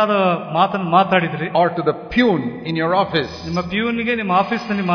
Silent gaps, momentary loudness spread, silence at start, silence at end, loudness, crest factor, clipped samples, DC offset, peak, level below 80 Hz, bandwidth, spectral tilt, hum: none; 6 LU; 0 s; 0 s; -18 LUFS; 16 dB; under 0.1%; under 0.1%; -2 dBFS; -48 dBFS; 5.4 kHz; -7 dB/octave; none